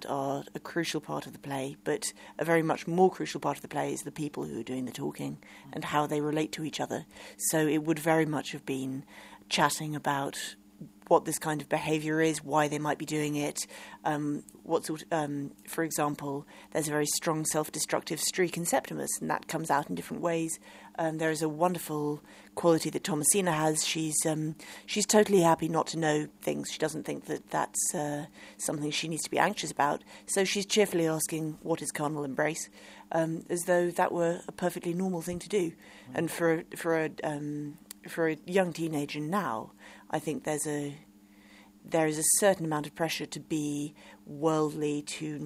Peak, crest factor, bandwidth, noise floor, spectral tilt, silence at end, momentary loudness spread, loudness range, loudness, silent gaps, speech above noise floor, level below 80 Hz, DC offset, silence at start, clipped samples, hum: -8 dBFS; 22 dB; 16 kHz; -56 dBFS; -4 dB/octave; 0 s; 11 LU; 5 LU; -30 LUFS; none; 26 dB; -68 dBFS; under 0.1%; 0 s; under 0.1%; none